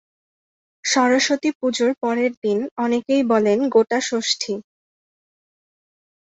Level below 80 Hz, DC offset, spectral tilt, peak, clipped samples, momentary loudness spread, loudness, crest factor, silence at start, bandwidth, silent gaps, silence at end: -68 dBFS; under 0.1%; -3 dB/octave; -4 dBFS; under 0.1%; 6 LU; -20 LUFS; 18 dB; 0.85 s; 8.4 kHz; 1.55-1.60 s, 2.37-2.42 s, 2.71-2.76 s; 1.6 s